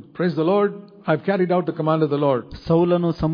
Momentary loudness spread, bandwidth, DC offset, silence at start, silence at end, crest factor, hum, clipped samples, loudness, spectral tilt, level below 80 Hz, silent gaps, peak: 5 LU; 5.2 kHz; under 0.1%; 0.15 s; 0 s; 14 dB; none; under 0.1%; -21 LUFS; -10 dB/octave; -48 dBFS; none; -6 dBFS